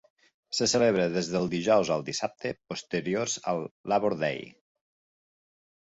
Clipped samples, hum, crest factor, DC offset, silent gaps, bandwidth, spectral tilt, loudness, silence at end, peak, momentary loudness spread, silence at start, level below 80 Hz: under 0.1%; none; 18 dB; under 0.1%; 3.71-3.84 s; 8.4 kHz; -4 dB/octave; -28 LUFS; 1.35 s; -10 dBFS; 11 LU; 0.5 s; -64 dBFS